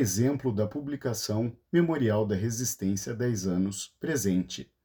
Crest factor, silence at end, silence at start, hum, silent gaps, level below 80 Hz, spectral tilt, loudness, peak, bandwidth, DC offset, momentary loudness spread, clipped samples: 16 dB; 0.2 s; 0 s; none; none; -62 dBFS; -5.5 dB/octave; -29 LUFS; -12 dBFS; 19.5 kHz; under 0.1%; 6 LU; under 0.1%